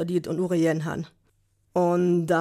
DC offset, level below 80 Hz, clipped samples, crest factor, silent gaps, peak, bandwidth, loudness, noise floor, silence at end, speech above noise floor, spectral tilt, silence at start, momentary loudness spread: under 0.1%; -62 dBFS; under 0.1%; 14 dB; none; -10 dBFS; 13.5 kHz; -25 LUFS; -67 dBFS; 0 s; 43 dB; -7.5 dB/octave; 0 s; 11 LU